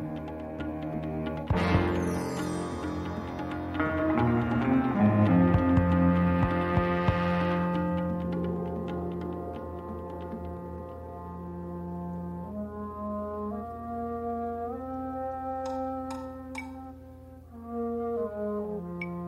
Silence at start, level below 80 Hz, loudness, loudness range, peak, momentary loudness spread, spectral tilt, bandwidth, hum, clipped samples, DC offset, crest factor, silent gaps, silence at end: 0 s; -46 dBFS; -30 LUFS; 13 LU; -12 dBFS; 15 LU; -8 dB/octave; 12 kHz; 60 Hz at -55 dBFS; under 0.1%; under 0.1%; 18 dB; none; 0 s